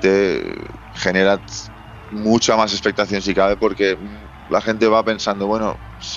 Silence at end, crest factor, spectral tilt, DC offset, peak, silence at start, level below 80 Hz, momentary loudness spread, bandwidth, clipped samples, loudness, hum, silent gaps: 0 s; 16 dB; -4 dB/octave; under 0.1%; -2 dBFS; 0 s; -42 dBFS; 16 LU; 8 kHz; under 0.1%; -18 LUFS; none; none